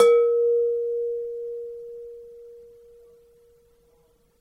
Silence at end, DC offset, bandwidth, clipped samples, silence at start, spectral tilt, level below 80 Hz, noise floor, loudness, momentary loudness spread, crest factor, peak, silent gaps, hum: 1.8 s; under 0.1%; 10.5 kHz; under 0.1%; 0 s; -2.5 dB/octave; -68 dBFS; -62 dBFS; -24 LUFS; 25 LU; 20 dB; -6 dBFS; none; none